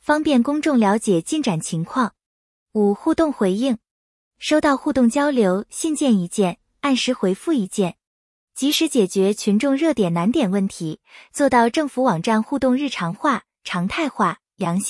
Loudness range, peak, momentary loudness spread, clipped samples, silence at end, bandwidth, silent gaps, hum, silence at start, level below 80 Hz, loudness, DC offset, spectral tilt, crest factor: 2 LU; -4 dBFS; 8 LU; under 0.1%; 0 s; 12 kHz; 2.26-2.66 s, 3.91-4.31 s, 8.07-8.48 s; none; 0.1 s; -56 dBFS; -20 LUFS; under 0.1%; -5 dB/octave; 16 dB